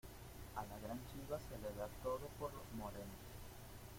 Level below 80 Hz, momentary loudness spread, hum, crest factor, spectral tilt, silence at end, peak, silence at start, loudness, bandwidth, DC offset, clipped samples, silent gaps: -60 dBFS; 10 LU; none; 18 dB; -5.5 dB/octave; 0 s; -32 dBFS; 0.05 s; -50 LUFS; 16.5 kHz; under 0.1%; under 0.1%; none